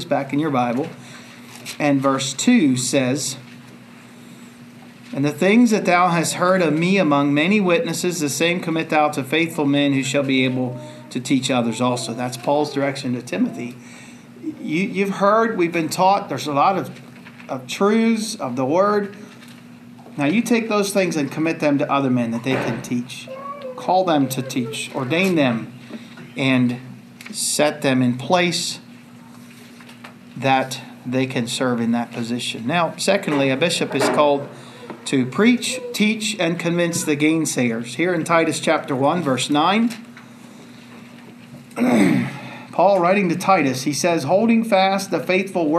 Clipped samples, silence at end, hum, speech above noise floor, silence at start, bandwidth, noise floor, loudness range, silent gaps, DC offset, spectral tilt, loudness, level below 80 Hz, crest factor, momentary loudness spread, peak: under 0.1%; 0 s; none; 23 dB; 0 s; 14 kHz; -42 dBFS; 4 LU; none; under 0.1%; -4.5 dB/octave; -19 LUFS; -70 dBFS; 18 dB; 15 LU; -2 dBFS